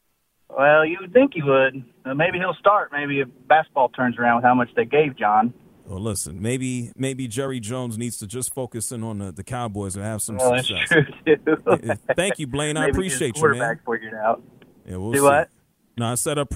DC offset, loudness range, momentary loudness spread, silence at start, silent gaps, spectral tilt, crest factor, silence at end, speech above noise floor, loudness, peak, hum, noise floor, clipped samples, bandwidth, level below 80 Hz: under 0.1%; 8 LU; 11 LU; 0.5 s; none; -4.5 dB/octave; 20 dB; 0 s; 42 dB; -21 LUFS; -2 dBFS; none; -64 dBFS; under 0.1%; 16 kHz; -50 dBFS